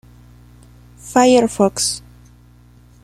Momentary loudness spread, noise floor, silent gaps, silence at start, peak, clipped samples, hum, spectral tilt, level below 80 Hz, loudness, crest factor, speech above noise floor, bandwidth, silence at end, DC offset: 15 LU; -47 dBFS; none; 1.05 s; -2 dBFS; under 0.1%; 60 Hz at -40 dBFS; -3.5 dB/octave; -48 dBFS; -15 LUFS; 18 dB; 32 dB; 15 kHz; 1.05 s; under 0.1%